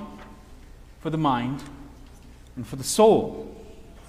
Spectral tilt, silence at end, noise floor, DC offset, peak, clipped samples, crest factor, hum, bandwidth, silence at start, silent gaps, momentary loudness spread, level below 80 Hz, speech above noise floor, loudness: -5 dB/octave; 0 s; -46 dBFS; under 0.1%; -6 dBFS; under 0.1%; 22 dB; none; 15.5 kHz; 0 s; none; 26 LU; -48 dBFS; 24 dB; -23 LUFS